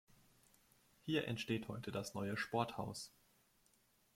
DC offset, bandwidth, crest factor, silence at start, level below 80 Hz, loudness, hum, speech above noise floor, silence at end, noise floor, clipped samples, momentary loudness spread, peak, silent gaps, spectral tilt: under 0.1%; 16.5 kHz; 24 dB; 1.05 s; -74 dBFS; -43 LUFS; none; 33 dB; 1.1 s; -75 dBFS; under 0.1%; 10 LU; -22 dBFS; none; -5 dB/octave